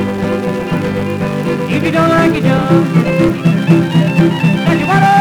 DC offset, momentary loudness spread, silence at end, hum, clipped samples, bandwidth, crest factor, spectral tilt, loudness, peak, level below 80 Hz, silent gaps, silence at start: under 0.1%; 6 LU; 0 s; none; under 0.1%; 13.5 kHz; 12 dB; -7.5 dB/octave; -12 LUFS; 0 dBFS; -40 dBFS; none; 0 s